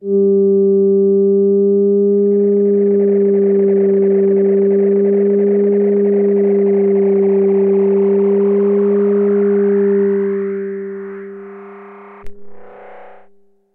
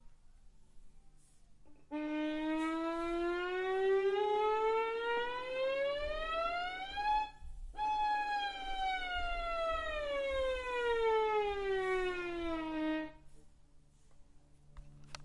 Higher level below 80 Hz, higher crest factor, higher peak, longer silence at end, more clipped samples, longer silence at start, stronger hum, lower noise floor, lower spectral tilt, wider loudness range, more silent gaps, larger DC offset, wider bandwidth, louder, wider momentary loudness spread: about the same, -54 dBFS vs -52 dBFS; second, 8 dB vs 14 dB; first, -6 dBFS vs -22 dBFS; first, 0.55 s vs 0 s; neither; about the same, 0 s vs 0.05 s; neither; second, -50 dBFS vs -61 dBFS; first, -13 dB/octave vs -4.5 dB/octave; about the same, 7 LU vs 5 LU; neither; neither; second, 2.8 kHz vs 11.5 kHz; first, -13 LUFS vs -36 LUFS; about the same, 8 LU vs 7 LU